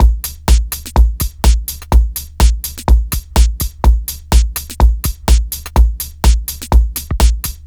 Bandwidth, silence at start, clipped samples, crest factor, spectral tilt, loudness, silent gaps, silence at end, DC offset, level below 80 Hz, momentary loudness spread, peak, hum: over 20 kHz; 0 s; under 0.1%; 12 dB; -4.5 dB/octave; -15 LUFS; none; 0.1 s; under 0.1%; -12 dBFS; 4 LU; 0 dBFS; none